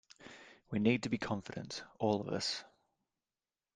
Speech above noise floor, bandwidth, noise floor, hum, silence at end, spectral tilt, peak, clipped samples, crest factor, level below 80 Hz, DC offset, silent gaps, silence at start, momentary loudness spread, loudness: over 54 dB; 9.8 kHz; under -90 dBFS; none; 1.1 s; -5 dB/octave; -18 dBFS; under 0.1%; 22 dB; -72 dBFS; under 0.1%; none; 0.2 s; 21 LU; -37 LUFS